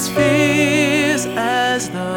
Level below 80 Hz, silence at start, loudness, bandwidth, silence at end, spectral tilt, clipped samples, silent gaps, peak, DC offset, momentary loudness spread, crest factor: -48 dBFS; 0 s; -16 LUFS; 19 kHz; 0 s; -4 dB/octave; under 0.1%; none; -2 dBFS; under 0.1%; 5 LU; 14 dB